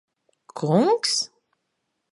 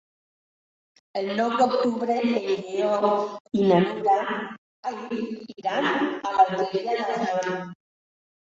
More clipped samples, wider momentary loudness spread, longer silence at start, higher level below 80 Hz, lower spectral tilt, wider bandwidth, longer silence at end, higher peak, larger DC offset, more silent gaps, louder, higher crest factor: neither; about the same, 13 LU vs 12 LU; second, 0.55 s vs 1.15 s; second, -76 dBFS vs -70 dBFS; second, -4.5 dB/octave vs -6 dB/octave; first, 11.5 kHz vs 7.8 kHz; about the same, 0.85 s vs 0.75 s; about the same, -6 dBFS vs -6 dBFS; neither; second, none vs 3.40-3.45 s, 4.58-4.83 s; first, -22 LUFS vs -25 LUFS; about the same, 20 dB vs 20 dB